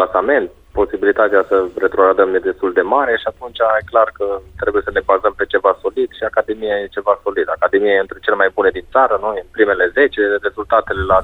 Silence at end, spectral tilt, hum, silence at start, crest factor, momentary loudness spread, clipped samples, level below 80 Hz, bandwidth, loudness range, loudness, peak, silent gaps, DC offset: 0 s; -7 dB/octave; none; 0 s; 16 dB; 6 LU; under 0.1%; -42 dBFS; 4.2 kHz; 2 LU; -16 LUFS; 0 dBFS; none; under 0.1%